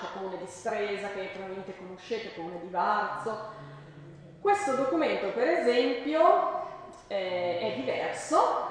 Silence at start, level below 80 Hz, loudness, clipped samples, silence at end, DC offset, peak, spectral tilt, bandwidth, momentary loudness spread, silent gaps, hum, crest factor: 0 s; -68 dBFS; -29 LUFS; under 0.1%; 0 s; under 0.1%; -8 dBFS; -4.5 dB/octave; 10 kHz; 18 LU; none; none; 20 dB